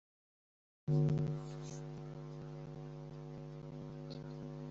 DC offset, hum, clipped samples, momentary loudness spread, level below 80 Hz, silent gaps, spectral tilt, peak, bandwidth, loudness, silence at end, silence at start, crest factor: under 0.1%; none; under 0.1%; 14 LU; -64 dBFS; none; -9 dB/octave; -24 dBFS; 7.8 kHz; -42 LUFS; 0 s; 0.85 s; 18 dB